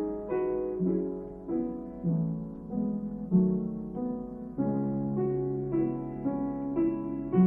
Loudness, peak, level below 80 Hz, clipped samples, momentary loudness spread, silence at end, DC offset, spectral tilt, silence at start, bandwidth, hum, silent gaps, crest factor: -31 LUFS; -14 dBFS; -54 dBFS; under 0.1%; 7 LU; 0 s; under 0.1%; -13.5 dB/octave; 0 s; 2.9 kHz; none; none; 16 dB